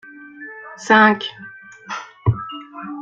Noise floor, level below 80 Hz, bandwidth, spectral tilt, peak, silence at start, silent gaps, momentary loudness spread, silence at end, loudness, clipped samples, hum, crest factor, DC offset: -38 dBFS; -50 dBFS; 7.8 kHz; -5.5 dB/octave; -2 dBFS; 0.2 s; none; 25 LU; 0 s; -17 LUFS; under 0.1%; none; 20 dB; under 0.1%